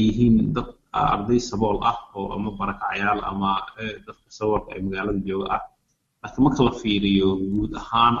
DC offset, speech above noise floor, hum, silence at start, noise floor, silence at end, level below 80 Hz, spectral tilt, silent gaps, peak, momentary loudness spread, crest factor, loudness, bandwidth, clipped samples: under 0.1%; 48 dB; none; 0 s; -70 dBFS; 0 s; -40 dBFS; -6.5 dB/octave; none; -4 dBFS; 12 LU; 18 dB; -23 LUFS; 7.6 kHz; under 0.1%